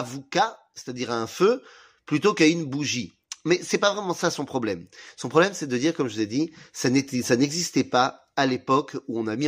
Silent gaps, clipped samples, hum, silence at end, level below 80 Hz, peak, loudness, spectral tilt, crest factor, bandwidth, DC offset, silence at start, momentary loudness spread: none; under 0.1%; none; 0 s; -68 dBFS; -4 dBFS; -24 LUFS; -4.5 dB/octave; 20 dB; 15.5 kHz; under 0.1%; 0 s; 10 LU